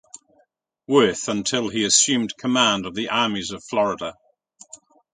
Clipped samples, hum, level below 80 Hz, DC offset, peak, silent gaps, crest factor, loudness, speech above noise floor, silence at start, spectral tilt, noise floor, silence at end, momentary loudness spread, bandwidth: under 0.1%; none; -60 dBFS; under 0.1%; -2 dBFS; none; 20 dB; -20 LUFS; 44 dB; 0.9 s; -2.5 dB/octave; -65 dBFS; 0.4 s; 9 LU; 9.6 kHz